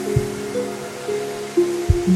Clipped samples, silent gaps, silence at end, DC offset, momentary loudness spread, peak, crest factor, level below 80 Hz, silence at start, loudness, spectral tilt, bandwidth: under 0.1%; none; 0 s; under 0.1%; 7 LU; -2 dBFS; 18 dB; -32 dBFS; 0 s; -23 LUFS; -6.5 dB/octave; 16 kHz